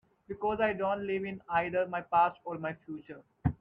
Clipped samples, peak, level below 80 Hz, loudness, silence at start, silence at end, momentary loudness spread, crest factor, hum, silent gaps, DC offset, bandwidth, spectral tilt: under 0.1%; -14 dBFS; -56 dBFS; -32 LUFS; 0.3 s; 0.05 s; 16 LU; 18 dB; none; none; under 0.1%; 5.2 kHz; -9.5 dB/octave